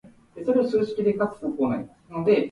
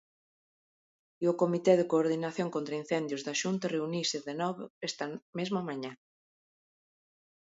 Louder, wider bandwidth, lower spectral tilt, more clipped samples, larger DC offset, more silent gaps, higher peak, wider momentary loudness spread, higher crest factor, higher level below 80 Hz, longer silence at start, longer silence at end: first, -25 LUFS vs -32 LUFS; first, 10.5 kHz vs 8 kHz; first, -8 dB/octave vs -5 dB/octave; neither; neither; second, none vs 4.70-4.81 s, 5.22-5.33 s; about the same, -8 dBFS vs -10 dBFS; about the same, 10 LU vs 12 LU; second, 16 dB vs 22 dB; first, -60 dBFS vs -82 dBFS; second, 0.05 s vs 1.2 s; second, 0 s vs 1.5 s